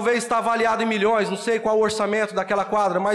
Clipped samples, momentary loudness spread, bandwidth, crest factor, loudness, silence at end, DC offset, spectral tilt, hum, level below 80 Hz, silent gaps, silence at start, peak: under 0.1%; 3 LU; 12.5 kHz; 10 dB; -21 LUFS; 0 s; under 0.1%; -4 dB/octave; none; -60 dBFS; none; 0 s; -12 dBFS